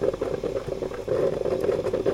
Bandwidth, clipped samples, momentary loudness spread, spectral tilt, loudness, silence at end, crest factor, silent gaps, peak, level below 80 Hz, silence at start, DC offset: 15.5 kHz; under 0.1%; 5 LU; -7 dB/octave; -27 LUFS; 0 s; 18 dB; none; -8 dBFS; -46 dBFS; 0 s; under 0.1%